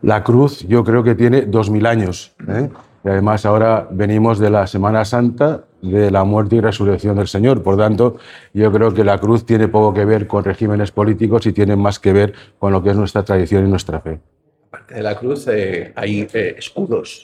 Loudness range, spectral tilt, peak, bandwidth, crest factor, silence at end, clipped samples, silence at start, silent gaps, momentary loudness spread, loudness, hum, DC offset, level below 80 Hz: 4 LU; -8 dB/octave; 0 dBFS; 11 kHz; 14 dB; 0.05 s; under 0.1%; 0.05 s; none; 9 LU; -15 LUFS; none; under 0.1%; -46 dBFS